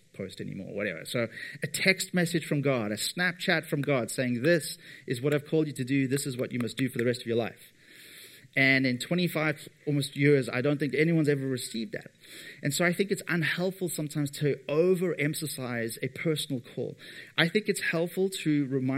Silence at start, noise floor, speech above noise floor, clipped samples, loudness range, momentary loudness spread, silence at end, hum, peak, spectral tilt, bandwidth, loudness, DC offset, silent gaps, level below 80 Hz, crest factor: 0.15 s; -51 dBFS; 23 dB; under 0.1%; 3 LU; 13 LU; 0 s; none; -6 dBFS; -5 dB/octave; 16 kHz; -29 LUFS; under 0.1%; none; -74 dBFS; 22 dB